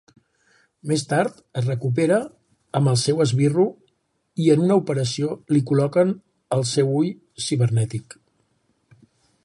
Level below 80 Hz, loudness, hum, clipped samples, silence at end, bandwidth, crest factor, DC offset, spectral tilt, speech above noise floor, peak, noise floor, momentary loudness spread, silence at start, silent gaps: -62 dBFS; -21 LUFS; none; under 0.1%; 1.45 s; 11.5 kHz; 18 dB; under 0.1%; -6 dB/octave; 49 dB; -4 dBFS; -69 dBFS; 9 LU; 0.85 s; none